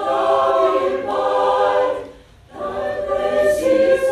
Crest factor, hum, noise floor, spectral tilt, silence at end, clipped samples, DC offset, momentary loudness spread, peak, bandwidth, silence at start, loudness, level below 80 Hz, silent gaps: 14 dB; none; -42 dBFS; -4.5 dB/octave; 0 s; under 0.1%; under 0.1%; 11 LU; -4 dBFS; 13.5 kHz; 0 s; -18 LUFS; -48 dBFS; none